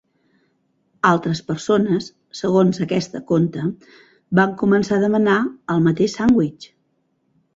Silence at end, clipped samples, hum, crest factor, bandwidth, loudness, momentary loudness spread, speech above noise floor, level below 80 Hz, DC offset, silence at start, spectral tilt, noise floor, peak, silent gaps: 0.9 s; under 0.1%; none; 18 dB; 7.8 kHz; -19 LUFS; 8 LU; 49 dB; -56 dBFS; under 0.1%; 1.05 s; -7 dB/octave; -67 dBFS; -2 dBFS; none